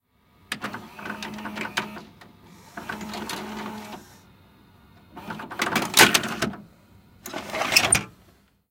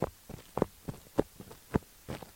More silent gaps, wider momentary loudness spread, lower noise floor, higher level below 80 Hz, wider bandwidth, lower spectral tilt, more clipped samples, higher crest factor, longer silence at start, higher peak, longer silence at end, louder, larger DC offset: neither; first, 25 LU vs 13 LU; first, -59 dBFS vs -52 dBFS; about the same, -56 dBFS vs -52 dBFS; about the same, 17 kHz vs 17 kHz; second, -1.5 dB/octave vs -7 dB/octave; neither; about the same, 28 dB vs 26 dB; first, 0.5 s vs 0 s; first, 0 dBFS vs -10 dBFS; first, 0.6 s vs 0.05 s; first, -23 LUFS vs -37 LUFS; neither